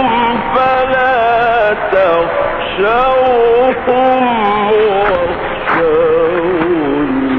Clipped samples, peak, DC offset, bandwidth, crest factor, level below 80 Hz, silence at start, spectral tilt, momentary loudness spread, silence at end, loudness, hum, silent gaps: under 0.1%; -2 dBFS; under 0.1%; 5.4 kHz; 10 dB; -36 dBFS; 0 s; -3 dB/octave; 4 LU; 0 s; -12 LUFS; none; none